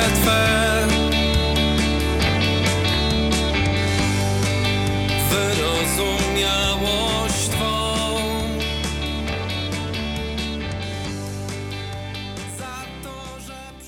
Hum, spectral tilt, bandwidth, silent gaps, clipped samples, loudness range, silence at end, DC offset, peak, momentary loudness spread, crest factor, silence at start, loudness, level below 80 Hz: none; -4 dB/octave; 19 kHz; none; under 0.1%; 9 LU; 0 s; under 0.1%; -4 dBFS; 12 LU; 16 dB; 0 s; -21 LUFS; -30 dBFS